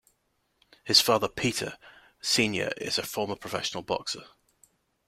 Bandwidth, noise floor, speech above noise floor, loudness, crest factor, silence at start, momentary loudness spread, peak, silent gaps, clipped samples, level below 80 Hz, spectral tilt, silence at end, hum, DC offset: 16.5 kHz; -74 dBFS; 46 dB; -27 LUFS; 24 dB; 0.85 s; 14 LU; -6 dBFS; none; under 0.1%; -62 dBFS; -2.5 dB/octave; 0.8 s; none; under 0.1%